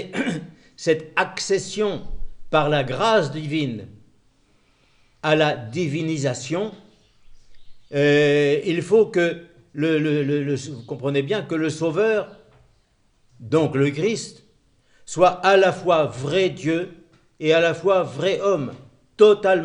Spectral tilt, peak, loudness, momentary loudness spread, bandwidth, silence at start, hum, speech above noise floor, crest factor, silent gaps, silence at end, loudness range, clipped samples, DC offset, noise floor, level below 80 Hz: -5.5 dB/octave; -2 dBFS; -21 LUFS; 12 LU; 10.5 kHz; 0 s; none; 42 dB; 20 dB; none; 0 s; 5 LU; under 0.1%; under 0.1%; -62 dBFS; -46 dBFS